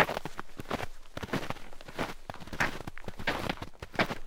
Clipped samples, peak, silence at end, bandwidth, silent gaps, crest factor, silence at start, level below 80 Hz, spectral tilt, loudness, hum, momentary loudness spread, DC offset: under 0.1%; -6 dBFS; 0 s; 18 kHz; none; 28 dB; 0 s; -46 dBFS; -4.5 dB/octave; -36 LUFS; none; 12 LU; under 0.1%